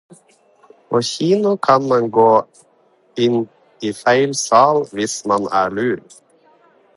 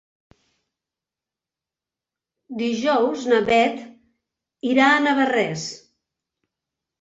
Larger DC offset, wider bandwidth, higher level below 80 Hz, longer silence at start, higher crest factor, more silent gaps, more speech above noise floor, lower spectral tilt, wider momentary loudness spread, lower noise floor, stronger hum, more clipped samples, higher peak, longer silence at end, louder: neither; first, 11.5 kHz vs 8 kHz; about the same, -62 dBFS vs -64 dBFS; second, 0.9 s vs 2.5 s; about the same, 18 dB vs 18 dB; neither; second, 40 dB vs 70 dB; about the same, -4.5 dB/octave vs -4 dB/octave; second, 10 LU vs 17 LU; second, -56 dBFS vs -89 dBFS; neither; neither; first, 0 dBFS vs -6 dBFS; second, 0.95 s vs 1.25 s; first, -16 LUFS vs -20 LUFS